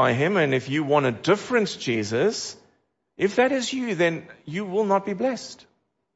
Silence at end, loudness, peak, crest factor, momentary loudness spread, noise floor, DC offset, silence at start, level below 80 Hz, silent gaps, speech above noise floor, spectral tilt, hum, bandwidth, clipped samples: 0.6 s; -24 LUFS; -6 dBFS; 18 dB; 11 LU; -68 dBFS; under 0.1%; 0 s; -66 dBFS; none; 45 dB; -5 dB/octave; none; 8 kHz; under 0.1%